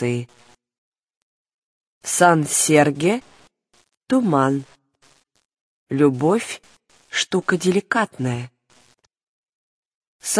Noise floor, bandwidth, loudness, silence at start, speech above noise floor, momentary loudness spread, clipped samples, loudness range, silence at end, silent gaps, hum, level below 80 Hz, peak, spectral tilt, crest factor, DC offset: -59 dBFS; 11 kHz; -19 LUFS; 0 s; 40 dB; 15 LU; under 0.1%; 5 LU; 0 s; 0.78-0.92 s, 1.17-1.45 s, 1.54-1.81 s, 1.87-2.01 s, 5.61-5.87 s, 9.23-10.01 s, 10.07-10.19 s; none; -64 dBFS; 0 dBFS; -4.5 dB/octave; 22 dB; under 0.1%